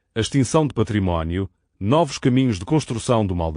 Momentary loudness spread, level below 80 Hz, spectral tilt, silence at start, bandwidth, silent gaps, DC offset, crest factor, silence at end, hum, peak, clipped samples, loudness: 7 LU; -40 dBFS; -6 dB/octave; 0.15 s; 10 kHz; none; under 0.1%; 16 dB; 0 s; none; -4 dBFS; under 0.1%; -21 LUFS